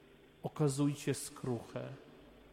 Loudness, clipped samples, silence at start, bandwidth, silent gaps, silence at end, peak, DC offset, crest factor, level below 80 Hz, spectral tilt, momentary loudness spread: -38 LUFS; under 0.1%; 0.1 s; 16 kHz; none; 0 s; -22 dBFS; under 0.1%; 16 dB; -70 dBFS; -6 dB/octave; 16 LU